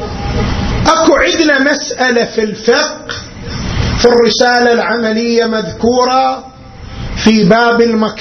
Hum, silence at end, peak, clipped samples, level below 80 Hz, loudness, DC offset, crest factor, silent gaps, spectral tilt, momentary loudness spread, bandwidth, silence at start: none; 0 s; 0 dBFS; 0.2%; -28 dBFS; -11 LUFS; under 0.1%; 12 dB; none; -4.5 dB/octave; 14 LU; 7 kHz; 0 s